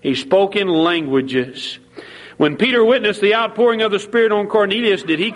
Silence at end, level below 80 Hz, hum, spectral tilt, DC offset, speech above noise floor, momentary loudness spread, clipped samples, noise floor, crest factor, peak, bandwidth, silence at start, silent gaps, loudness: 0 s; -60 dBFS; none; -5 dB/octave; under 0.1%; 21 dB; 11 LU; under 0.1%; -37 dBFS; 14 dB; -2 dBFS; 11.5 kHz; 0.05 s; none; -16 LUFS